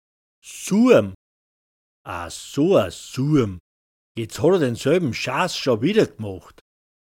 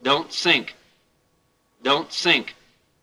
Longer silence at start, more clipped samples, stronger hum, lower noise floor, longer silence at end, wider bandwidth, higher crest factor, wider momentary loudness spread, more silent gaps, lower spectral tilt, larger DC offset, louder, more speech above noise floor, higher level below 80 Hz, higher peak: first, 0.45 s vs 0.05 s; neither; neither; first, under -90 dBFS vs -66 dBFS; first, 0.7 s vs 0.5 s; first, 17 kHz vs 14 kHz; about the same, 20 dB vs 22 dB; about the same, 16 LU vs 14 LU; first, 1.15-2.05 s, 3.60-4.15 s vs none; first, -6 dB/octave vs -2.5 dB/octave; neither; about the same, -20 LUFS vs -20 LUFS; first, over 70 dB vs 45 dB; first, -54 dBFS vs -70 dBFS; about the same, -2 dBFS vs -2 dBFS